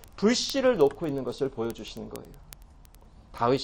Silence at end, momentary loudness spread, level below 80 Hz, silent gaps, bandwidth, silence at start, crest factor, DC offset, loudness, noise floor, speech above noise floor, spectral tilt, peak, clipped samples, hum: 0 s; 19 LU; -52 dBFS; none; 17 kHz; 0 s; 18 dB; under 0.1%; -27 LUFS; -52 dBFS; 25 dB; -4.5 dB/octave; -10 dBFS; under 0.1%; none